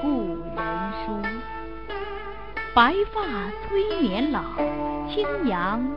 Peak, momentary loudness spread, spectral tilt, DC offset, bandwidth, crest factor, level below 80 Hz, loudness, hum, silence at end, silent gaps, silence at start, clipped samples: -4 dBFS; 14 LU; -7.5 dB/octave; 1%; 5.6 kHz; 22 dB; -42 dBFS; -26 LUFS; none; 0 s; none; 0 s; under 0.1%